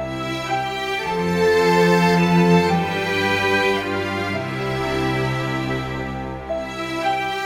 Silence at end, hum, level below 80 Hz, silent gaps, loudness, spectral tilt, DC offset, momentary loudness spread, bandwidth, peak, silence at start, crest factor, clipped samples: 0 s; none; -44 dBFS; none; -20 LUFS; -5.5 dB/octave; under 0.1%; 11 LU; 16 kHz; -4 dBFS; 0 s; 16 dB; under 0.1%